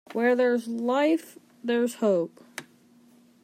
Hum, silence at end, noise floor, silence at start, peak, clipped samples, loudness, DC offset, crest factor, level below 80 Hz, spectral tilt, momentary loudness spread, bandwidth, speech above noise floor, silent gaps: none; 0.8 s; -57 dBFS; 0.1 s; -12 dBFS; under 0.1%; -26 LUFS; under 0.1%; 14 dB; -86 dBFS; -5 dB/octave; 17 LU; 15.5 kHz; 33 dB; none